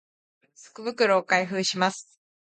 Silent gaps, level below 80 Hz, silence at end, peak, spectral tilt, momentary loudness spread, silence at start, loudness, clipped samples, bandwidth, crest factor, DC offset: none; -76 dBFS; 0.4 s; -8 dBFS; -3.5 dB/octave; 13 LU; 0.6 s; -24 LUFS; under 0.1%; 9.4 kHz; 20 dB; under 0.1%